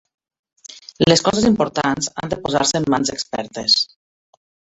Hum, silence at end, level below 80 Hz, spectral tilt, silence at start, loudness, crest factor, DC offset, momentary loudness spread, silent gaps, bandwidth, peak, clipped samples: none; 0.9 s; -50 dBFS; -3.5 dB/octave; 0.7 s; -18 LUFS; 18 dB; under 0.1%; 11 LU; none; 8.2 kHz; -2 dBFS; under 0.1%